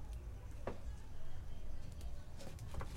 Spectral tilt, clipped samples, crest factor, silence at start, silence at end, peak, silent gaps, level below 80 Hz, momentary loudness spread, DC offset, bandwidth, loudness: -6 dB/octave; under 0.1%; 14 dB; 0 s; 0 s; -28 dBFS; none; -48 dBFS; 5 LU; under 0.1%; 12 kHz; -52 LUFS